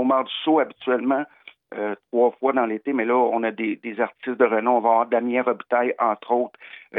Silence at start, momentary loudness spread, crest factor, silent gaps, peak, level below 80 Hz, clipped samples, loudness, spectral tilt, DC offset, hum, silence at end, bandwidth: 0 s; 9 LU; 18 dB; none; -6 dBFS; -86 dBFS; under 0.1%; -22 LUFS; -8.5 dB/octave; under 0.1%; none; 0 s; 4 kHz